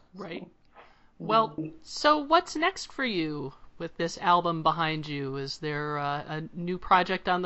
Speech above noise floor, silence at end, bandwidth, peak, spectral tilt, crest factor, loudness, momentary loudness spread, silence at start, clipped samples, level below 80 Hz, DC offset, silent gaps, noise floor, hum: 27 dB; 0 s; 8 kHz; -8 dBFS; -3 dB/octave; 20 dB; -28 LUFS; 16 LU; 0.15 s; under 0.1%; -56 dBFS; under 0.1%; none; -55 dBFS; none